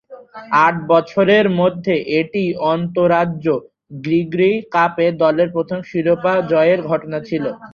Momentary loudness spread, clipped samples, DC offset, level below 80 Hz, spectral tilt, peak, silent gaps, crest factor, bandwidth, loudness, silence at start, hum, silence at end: 9 LU; under 0.1%; under 0.1%; -58 dBFS; -8 dB/octave; -2 dBFS; none; 16 dB; 6.8 kHz; -17 LUFS; 0.1 s; none; 0.05 s